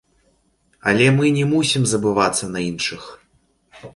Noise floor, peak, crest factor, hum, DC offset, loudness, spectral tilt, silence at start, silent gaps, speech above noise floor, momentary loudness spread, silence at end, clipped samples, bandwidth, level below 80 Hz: -62 dBFS; -2 dBFS; 18 dB; none; under 0.1%; -18 LUFS; -4.5 dB/octave; 0.85 s; none; 44 dB; 10 LU; 0.05 s; under 0.1%; 11.5 kHz; -52 dBFS